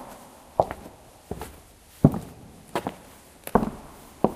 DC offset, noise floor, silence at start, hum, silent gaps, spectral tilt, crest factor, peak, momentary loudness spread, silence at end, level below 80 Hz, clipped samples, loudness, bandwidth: under 0.1%; -50 dBFS; 0 s; none; none; -7.5 dB/octave; 28 dB; -2 dBFS; 24 LU; 0 s; -46 dBFS; under 0.1%; -27 LUFS; 15.5 kHz